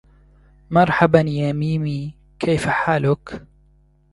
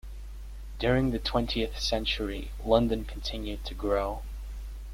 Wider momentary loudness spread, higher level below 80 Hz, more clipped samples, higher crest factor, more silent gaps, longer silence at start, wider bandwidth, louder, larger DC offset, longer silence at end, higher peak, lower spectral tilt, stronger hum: second, 14 LU vs 18 LU; second, -46 dBFS vs -38 dBFS; neither; about the same, 20 dB vs 22 dB; neither; first, 0.7 s vs 0.05 s; second, 11.5 kHz vs 16 kHz; first, -19 LUFS vs -30 LUFS; neither; first, 0.7 s vs 0 s; first, 0 dBFS vs -8 dBFS; first, -7 dB/octave vs -5.5 dB/octave; neither